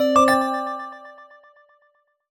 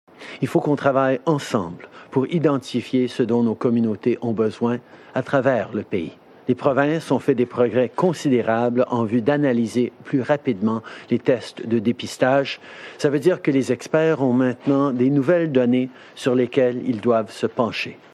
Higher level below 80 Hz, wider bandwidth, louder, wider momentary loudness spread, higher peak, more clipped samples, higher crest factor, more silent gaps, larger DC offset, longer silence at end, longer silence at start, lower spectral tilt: first, -58 dBFS vs -68 dBFS; first, over 20 kHz vs 12.5 kHz; about the same, -20 LUFS vs -21 LUFS; first, 25 LU vs 8 LU; about the same, -4 dBFS vs -4 dBFS; neither; about the same, 18 dB vs 16 dB; neither; neither; first, 1.05 s vs 0.15 s; second, 0 s vs 0.2 s; second, -3.5 dB/octave vs -7 dB/octave